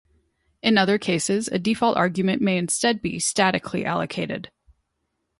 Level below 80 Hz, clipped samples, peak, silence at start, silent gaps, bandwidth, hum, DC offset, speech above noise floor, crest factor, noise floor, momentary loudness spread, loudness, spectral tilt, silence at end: -58 dBFS; under 0.1%; -4 dBFS; 0.65 s; none; 11.5 kHz; none; under 0.1%; 54 dB; 20 dB; -76 dBFS; 6 LU; -22 LUFS; -4 dB/octave; 0.95 s